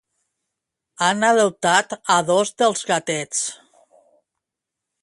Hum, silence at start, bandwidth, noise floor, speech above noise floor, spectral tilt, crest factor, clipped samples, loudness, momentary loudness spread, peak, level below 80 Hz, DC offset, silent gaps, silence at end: none; 1 s; 11.5 kHz; -84 dBFS; 65 dB; -2.5 dB/octave; 20 dB; under 0.1%; -19 LUFS; 7 LU; -2 dBFS; -70 dBFS; under 0.1%; none; 1.5 s